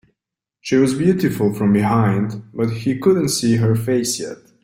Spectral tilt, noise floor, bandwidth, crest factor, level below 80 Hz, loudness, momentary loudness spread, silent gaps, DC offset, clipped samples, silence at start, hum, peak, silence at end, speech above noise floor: -6 dB/octave; -81 dBFS; 16.5 kHz; 14 dB; -52 dBFS; -18 LUFS; 8 LU; none; under 0.1%; under 0.1%; 0.65 s; none; -4 dBFS; 0.3 s; 64 dB